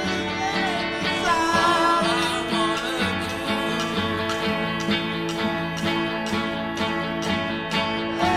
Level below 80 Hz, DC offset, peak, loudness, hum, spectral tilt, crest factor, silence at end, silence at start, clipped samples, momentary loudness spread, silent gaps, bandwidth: -50 dBFS; under 0.1%; -8 dBFS; -23 LUFS; none; -4 dB/octave; 16 dB; 0 s; 0 s; under 0.1%; 6 LU; none; 15.5 kHz